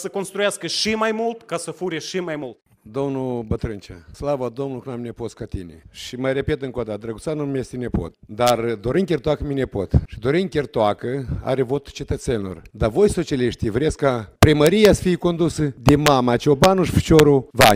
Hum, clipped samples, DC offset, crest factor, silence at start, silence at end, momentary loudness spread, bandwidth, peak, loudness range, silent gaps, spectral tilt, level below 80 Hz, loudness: none; under 0.1%; under 0.1%; 20 dB; 0 s; 0 s; 15 LU; 16 kHz; 0 dBFS; 11 LU; none; -5.5 dB/octave; -38 dBFS; -20 LUFS